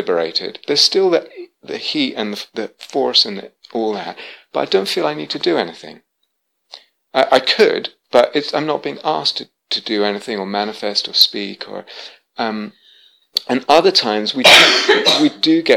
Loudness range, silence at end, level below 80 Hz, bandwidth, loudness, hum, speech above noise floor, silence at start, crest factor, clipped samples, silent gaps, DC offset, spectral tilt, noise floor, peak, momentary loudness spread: 7 LU; 0 s; -60 dBFS; 19 kHz; -15 LUFS; none; 54 dB; 0 s; 18 dB; under 0.1%; none; under 0.1%; -2.5 dB/octave; -70 dBFS; 0 dBFS; 17 LU